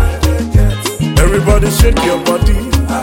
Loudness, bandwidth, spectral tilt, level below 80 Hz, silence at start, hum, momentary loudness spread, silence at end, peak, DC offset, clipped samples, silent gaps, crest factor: -12 LUFS; 17 kHz; -5.5 dB/octave; -14 dBFS; 0 s; none; 4 LU; 0 s; 0 dBFS; under 0.1%; under 0.1%; none; 10 dB